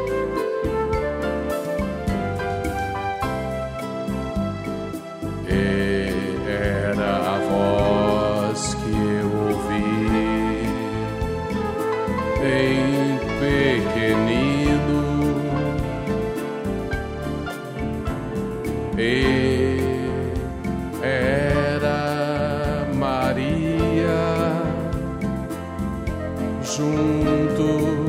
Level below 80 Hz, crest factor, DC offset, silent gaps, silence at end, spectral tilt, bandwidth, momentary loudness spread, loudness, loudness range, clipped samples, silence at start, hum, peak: -36 dBFS; 16 dB; under 0.1%; none; 0 s; -6.5 dB/octave; 16 kHz; 8 LU; -23 LUFS; 5 LU; under 0.1%; 0 s; none; -6 dBFS